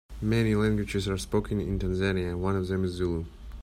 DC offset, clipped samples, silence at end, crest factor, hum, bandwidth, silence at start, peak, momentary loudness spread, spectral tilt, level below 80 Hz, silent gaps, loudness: under 0.1%; under 0.1%; 0 s; 16 dB; none; 14.5 kHz; 0.1 s; -12 dBFS; 6 LU; -6.5 dB/octave; -40 dBFS; none; -28 LUFS